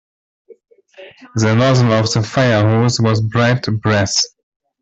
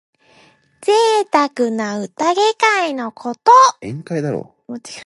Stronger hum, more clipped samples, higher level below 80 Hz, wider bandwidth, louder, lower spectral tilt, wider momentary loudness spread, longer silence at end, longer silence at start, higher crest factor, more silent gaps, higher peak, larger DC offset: neither; neither; first, -48 dBFS vs -64 dBFS; second, 8 kHz vs 11.5 kHz; about the same, -15 LUFS vs -15 LUFS; about the same, -5 dB/octave vs -4 dB/octave; second, 5 LU vs 17 LU; first, 0.55 s vs 0 s; second, 0.5 s vs 0.8 s; about the same, 14 dB vs 16 dB; neither; about the same, -2 dBFS vs 0 dBFS; neither